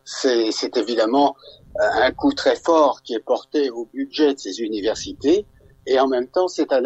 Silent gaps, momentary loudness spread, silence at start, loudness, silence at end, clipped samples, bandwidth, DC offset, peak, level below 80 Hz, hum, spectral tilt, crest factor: none; 9 LU; 0.05 s; -20 LUFS; 0 s; under 0.1%; 8.2 kHz; under 0.1%; -4 dBFS; -52 dBFS; none; -3.5 dB/octave; 16 dB